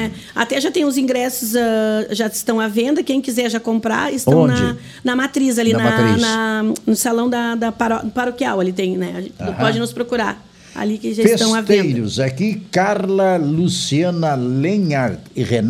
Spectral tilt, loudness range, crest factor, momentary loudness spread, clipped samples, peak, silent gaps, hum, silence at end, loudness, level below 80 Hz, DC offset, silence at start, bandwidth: -5 dB/octave; 3 LU; 18 dB; 7 LU; under 0.1%; 0 dBFS; none; none; 0 s; -17 LUFS; -50 dBFS; under 0.1%; 0 s; 16.5 kHz